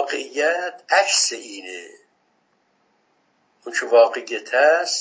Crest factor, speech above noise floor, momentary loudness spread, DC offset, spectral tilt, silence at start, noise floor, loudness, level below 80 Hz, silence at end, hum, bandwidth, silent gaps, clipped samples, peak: 20 dB; 46 dB; 18 LU; under 0.1%; 1.5 dB/octave; 0 s; -65 dBFS; -19 LUFS; under -90 dBFS; 0 s; none; 8 kHz; none; under 0.1%; -2 dBFS